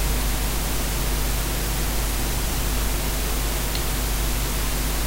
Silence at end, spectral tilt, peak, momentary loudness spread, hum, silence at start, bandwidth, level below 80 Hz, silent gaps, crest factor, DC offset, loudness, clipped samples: 0 s; -3.5 dB/octave; -8 dBFS; 0 LU; none; 0 s; 16 kHz; -26 dBFS; none; 14 dB; under 0.1%; -25 LUFS; under 0.1%